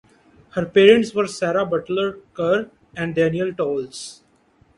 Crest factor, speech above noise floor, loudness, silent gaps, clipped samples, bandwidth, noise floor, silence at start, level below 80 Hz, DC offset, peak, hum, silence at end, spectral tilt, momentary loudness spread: 20 dB; 38 dB; -20 LUFS; none; under 0.1%; 11.5 kHz; -58 dBFS; 0.55 s; -58 dBFS; under 0.1%; 0 dBFS; none; 0.65 s; -5.5 dB/octave; 17 LU